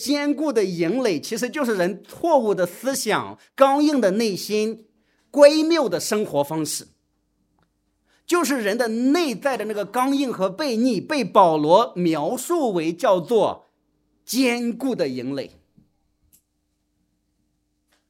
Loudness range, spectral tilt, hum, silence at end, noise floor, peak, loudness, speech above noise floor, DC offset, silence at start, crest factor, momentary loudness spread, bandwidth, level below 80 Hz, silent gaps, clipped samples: 8 LU; -4.5 dB/octave; none; 2.6 s; -72 dBFS; 0 dBFS; -21 LUFS; 51 dB; under 0.1%; 0 s; 22 dB; 10 LU; 16.5 kHz; -72 dBFS; none; under 0.1%